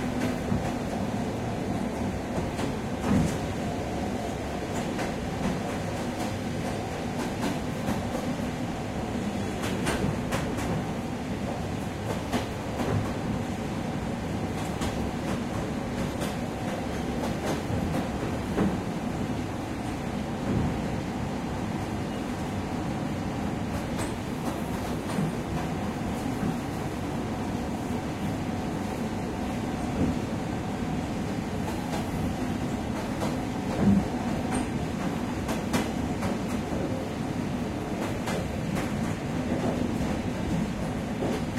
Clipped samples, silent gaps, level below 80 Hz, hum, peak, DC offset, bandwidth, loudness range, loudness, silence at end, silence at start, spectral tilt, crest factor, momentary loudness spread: under 0.1%; none; -42 dBFS; none; -12 dBFS; under 0.1%; 16 kHz; 2 LU; -30 LUFS; 0 s; 0 s; -6 dB/octave; 18 dB; 4 LU